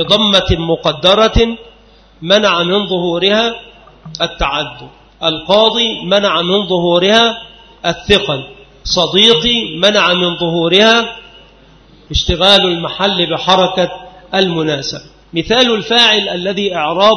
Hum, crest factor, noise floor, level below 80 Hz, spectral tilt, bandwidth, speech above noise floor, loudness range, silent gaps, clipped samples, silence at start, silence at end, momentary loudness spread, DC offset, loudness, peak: none; 14 dB; -44 dBFS; -32 dBFS; -4 dB/octave; 11 kHz; 32 dB; 4 LU; none; 0.1%; 0 s; 0 s; 12 LU; under 0.1%; -12 LUFS; 0 dBFS